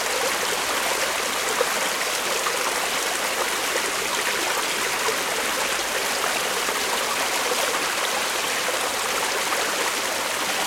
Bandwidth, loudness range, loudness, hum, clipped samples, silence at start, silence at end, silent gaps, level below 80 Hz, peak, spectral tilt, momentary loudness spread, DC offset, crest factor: 16.5 kHz; 0 LU; -22 LUFS; none; under 0.1%; 0 s; 0 s; none; -58 dBFS; -6 dBFS; 0 dB/octave; 1 LU; under 0.1%; 18 dB